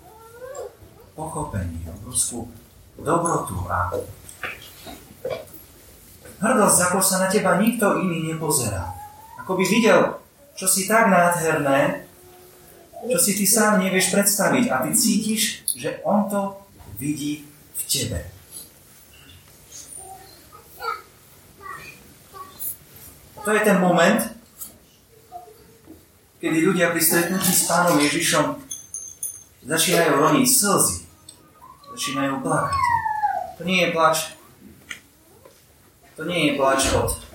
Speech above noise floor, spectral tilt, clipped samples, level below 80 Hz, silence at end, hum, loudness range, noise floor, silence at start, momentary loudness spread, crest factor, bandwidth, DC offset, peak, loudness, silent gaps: 33 dB; -3.5 dB/octave; under 0.1%; -48 dBFS; 0.05 s; none; 11 LU; -54 dBFS; 0.05 s; 22 LU; 20 dB; 17 kHz; under 0.1%; -2 dBFS; -20 LUFS; none